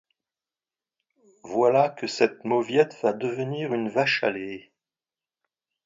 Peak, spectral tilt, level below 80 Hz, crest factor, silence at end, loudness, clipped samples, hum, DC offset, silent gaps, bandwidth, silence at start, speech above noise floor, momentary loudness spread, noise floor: -4 dBFS; -5.5 dB/octave; -74 dBFS; 22 dB; 1.25 s; -24 LUFS; under 0.1%; none; under 0.1%; none; 7.8 kHz; 1.45 s; over 66 dB; 9 LU; under -90 dBFS